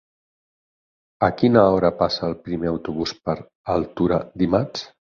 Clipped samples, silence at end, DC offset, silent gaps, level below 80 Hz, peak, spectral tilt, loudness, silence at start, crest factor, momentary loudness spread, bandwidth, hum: under 0.1%; 0.25 s; under 0.1%; 3.55-3.64 s; -46 dBFS; -2 dBFS; -7 dB/octave; -21 LUFS; 1.2 s; 20 dB; 12 LU; 7.2 kHz; none